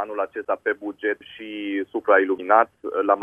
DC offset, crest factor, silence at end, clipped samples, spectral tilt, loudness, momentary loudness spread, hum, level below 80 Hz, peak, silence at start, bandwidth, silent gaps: under 0.1%; 22 dB; 0 s; under 0.1%; -6 dB/octave; -23 LUFS; 10 LU; none; -70 dBFS; -2 dBFS; 0 s; 3.7 kHz; none